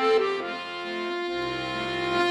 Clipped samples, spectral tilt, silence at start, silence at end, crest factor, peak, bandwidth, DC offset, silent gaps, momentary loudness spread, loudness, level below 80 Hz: under 0.1%; -4.5 dB/octave; 0 s; 0 s; 16 dB; -10 dBFS; 11 kHz; under 0.1%; none; 8 LU; -28 LUFS; -58 dBFS